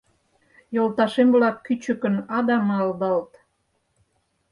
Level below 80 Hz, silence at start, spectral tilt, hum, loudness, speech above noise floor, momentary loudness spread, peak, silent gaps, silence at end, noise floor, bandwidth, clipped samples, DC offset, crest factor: -68 dBFS; 0.7 s; -7 dB/octave; none; -22 LUFS; 50 dB; 9 LU; -6 dBFS; none; 1.25 s; -71 dBFS; 11 kHz; under 0.1%; under 0.1%; 16 dB